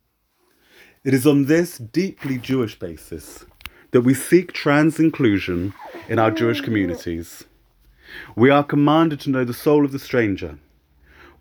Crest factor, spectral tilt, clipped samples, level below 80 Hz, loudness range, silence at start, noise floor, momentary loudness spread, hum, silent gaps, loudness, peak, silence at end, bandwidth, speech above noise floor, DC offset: 18 dB; -6.5 dB/octave; under 0.1%; -52 dBFS; 3 LU; 1.05 s; -66 dBFS; 20 LU; none; none; -19 LUFS; -2 dBFS; 0.85 s; over 20 kHz; 47 dB; under 0.1%